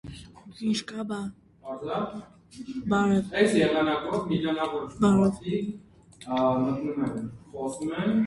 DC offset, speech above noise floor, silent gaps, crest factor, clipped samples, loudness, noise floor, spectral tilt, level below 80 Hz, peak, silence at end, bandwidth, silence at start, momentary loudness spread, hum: under 0.1%; 19 dB; none; 18 dB; under 0.1%; -27 LUFS; -46 dBFS; -6 dB/octave; -56 dBFS; -10 dBFS; 0 s; 11.5 kHz; 0.05 s; 18 LU; none